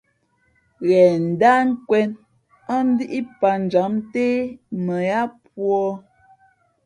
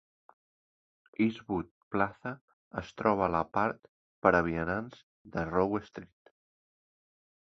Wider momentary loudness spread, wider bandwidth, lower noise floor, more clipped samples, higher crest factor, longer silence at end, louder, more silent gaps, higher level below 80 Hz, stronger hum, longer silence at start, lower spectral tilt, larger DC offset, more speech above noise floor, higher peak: second, 12 LU vs 19 LU; first, 10.5 kHz vs 7 kHz; second, -65 dBFS vs under -90 dBFS; neither; second, 18 dB vs 28 dB; second, 0.85 s vs 1.5 s; first, -20 LUFS vs -32 LUFS; second, none vs 1.71-1.91 s, 2.41-2.71 s, 3.89-4.22 s, 5.03-5.25 s; second, -64 dBFS vs -56 dBFS; neither; second, 0.8 s vs 1.2 s; about the same, -7.5 dB/octave vs -8 dB/octave; neither; second, 46 dB vs over 59 dB; first, -2 dBFS vs -6 dBFS